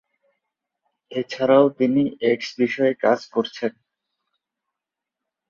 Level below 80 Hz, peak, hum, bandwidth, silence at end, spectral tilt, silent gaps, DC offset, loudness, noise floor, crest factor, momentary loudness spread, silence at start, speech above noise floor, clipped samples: -68 dBFS; -4 dBFS; none; 7.4 kHz; 1.8 s; -6 dB/octave; none; under 0.1%; -21 LUFS; -86 dBFS; 20 dB; 13 LU; 1.1 s; 66 dB; under 0.1%